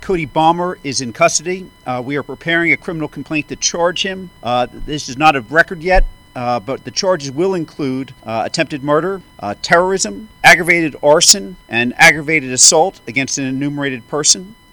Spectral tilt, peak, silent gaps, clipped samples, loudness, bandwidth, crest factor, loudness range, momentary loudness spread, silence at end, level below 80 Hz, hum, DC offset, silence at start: -2.5 dB/octave; 0 dBFS; none; 0.3%; -14 LUFS; over 20 kHz; 16 dB; 8 LU; 15 LU; 0.2 s; -30 dBFS; none; under 0.1%; 0 s